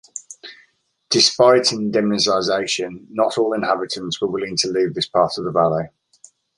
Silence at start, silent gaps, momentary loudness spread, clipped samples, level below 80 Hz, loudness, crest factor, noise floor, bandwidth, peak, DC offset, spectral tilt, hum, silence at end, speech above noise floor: 0.15 s; none; 13 LU; under 0.1%; -58 dBFS; -18 LUFS; 18 dB; -60 dBFS; 11.5 kHz; -2 dBFS; under 0.1%; -3.5 dB/octave; none; 0.7 s; 42 dB